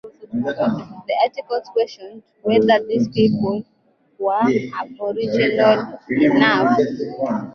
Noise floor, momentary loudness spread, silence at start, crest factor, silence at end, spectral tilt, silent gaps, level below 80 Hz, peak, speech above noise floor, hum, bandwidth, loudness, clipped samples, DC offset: -39 dBFS; 11 LU; 0.05 s; 16 dB; 0 s; -7 dB/octave; none; -58 dBFS; -2 dBFS; 21 dB; none; 6.8 kHz; -19 LUFS; under 0.1%; under 0.1%